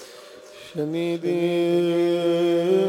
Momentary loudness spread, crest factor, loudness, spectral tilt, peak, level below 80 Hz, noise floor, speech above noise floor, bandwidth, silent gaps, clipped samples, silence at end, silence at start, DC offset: 21 LU; 14 dB; -22 LUFS; -6.5 dB/octave; -10 dBFS; -74 dBFS; -44 dBFS; 23 dB; 13 kHz; none; under 0.1%; 0 s; 0 s; under 0.1%